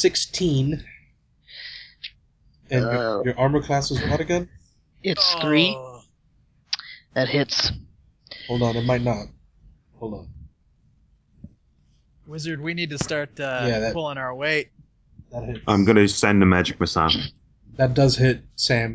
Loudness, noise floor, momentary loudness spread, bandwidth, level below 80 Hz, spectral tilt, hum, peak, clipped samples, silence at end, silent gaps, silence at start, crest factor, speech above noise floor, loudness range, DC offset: -22 LUFS; -61 dBFS; 21 LU; 8 kHz; -44 dBFS; -5 dB/octave; none; -2 dBFS; under 0.1%; 0 s; none; 0 s; 22 dB; 40 dB; 11 LU; under 0.1%